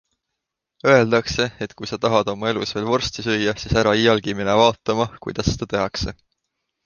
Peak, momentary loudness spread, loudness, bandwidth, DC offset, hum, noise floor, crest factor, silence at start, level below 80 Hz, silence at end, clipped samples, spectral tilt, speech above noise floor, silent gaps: -2 dBFS; 9 LU; -20 LUFS; 10 kHz; under 0.1%; none; -81 dBFS; 20 dB; 0.85 s; -40 dBFS; 0.75 s; under 0.1%; -5 dB/octave; 61 dB; none